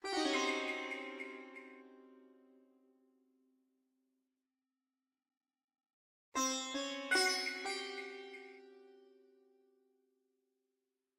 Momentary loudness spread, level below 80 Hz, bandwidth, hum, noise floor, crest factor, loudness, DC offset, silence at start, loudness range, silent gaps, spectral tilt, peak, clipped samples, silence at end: 21 LU; -86 dBFS; 16 kHz; none; under -90 dBFS; 22 dB; -37 LUFS; under 0.1%; 0.05 s; 16 LU; 5.37-5.41 s, 5.64-5.68 s, 5.93-6.32 s; 0.5 dB/octave; -22 dBFS; under 0.1%; 2.2 s